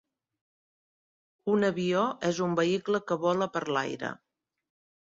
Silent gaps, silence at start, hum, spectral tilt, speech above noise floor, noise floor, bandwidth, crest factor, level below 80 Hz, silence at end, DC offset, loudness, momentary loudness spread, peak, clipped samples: none; 1.45 s; none; -5.5 dB/octave; over 62 dB; under -90 dBFS; 7.8 kHz; 18 dB; -72 dBFS; 0.95 s; under 0.1%; -29 LUFS; 10 LU; -14 dBFS; under 0.1%